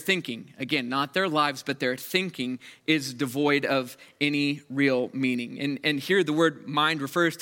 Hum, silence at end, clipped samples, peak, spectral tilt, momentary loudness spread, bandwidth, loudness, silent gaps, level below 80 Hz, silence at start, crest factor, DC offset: none; 0 s; under 0.1%; -8 dBFS; -4.5 dB/octave; 7 LU; 17 kHz; -26 LUFS; none; -76 dBFS; 0 s; 18 dB; under 0.1%